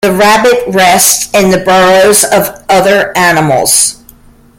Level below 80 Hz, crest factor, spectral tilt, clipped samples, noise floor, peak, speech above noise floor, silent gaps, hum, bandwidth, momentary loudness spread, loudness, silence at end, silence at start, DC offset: -40 dBFS; 8 dB; -2.5 dB/octave; 0.6%; -38 dBFS; 0 dBFS; 31 dB; none; none; over 20 kHz; 4 LU; -6 LUFS; 0.65 s; 0 s; under 0.1%